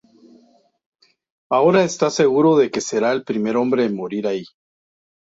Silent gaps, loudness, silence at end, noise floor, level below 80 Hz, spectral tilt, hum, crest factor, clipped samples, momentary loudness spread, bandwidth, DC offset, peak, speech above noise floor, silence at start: none; -18 LUFS; 0.95 s; -55 dBFS; -64 dBFS; -5 dB/octave; none; 16 dB; under 0.1%; 9 LU; 8 kHz; under 0.1%; -4 dBFS; 38 dB; 1.5 s